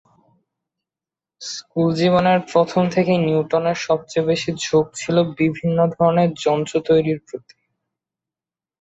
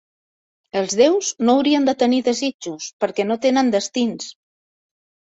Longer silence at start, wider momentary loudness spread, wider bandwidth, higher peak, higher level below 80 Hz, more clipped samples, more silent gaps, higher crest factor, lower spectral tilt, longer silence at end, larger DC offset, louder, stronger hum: first, 1.4 s vs 0.75 s; second, 9 LU vs 12 LU; about the same, 8 kHz vs 8 kHz; about the same, -4 dBFS vs -2 dBFS; first, -56 dBFS vs -66 dBFS; neither; second, none vs 2.54-2.59 s, 2.93-3.00 s; about the same, 16 dB vs 18 dB; first, -6 dB/octave vs -3.5 dB/octave; first, 1.45 s vs 1.05 s; neither; about the same, -19 LUFS vs -19 LUFS; neither